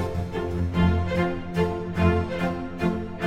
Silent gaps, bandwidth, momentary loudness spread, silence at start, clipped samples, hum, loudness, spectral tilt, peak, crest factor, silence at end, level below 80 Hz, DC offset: none; 10.5 kHz; 6 LU; 0 s; under 0.1%; none; -25 LUFS; -8 dB/octave; -8 dBFS; 16 dB; 0 s; -38 dBFS; under 0.1%